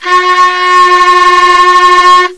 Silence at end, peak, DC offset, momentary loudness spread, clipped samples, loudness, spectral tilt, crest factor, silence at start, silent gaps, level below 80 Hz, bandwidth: 0.05 s; 0 dBFS; 1%; 3 LU; 6%; -4 LUFS; -0.5 dB/octave; 6 dB; 0 s; none; -40 dBFS; 11 kHz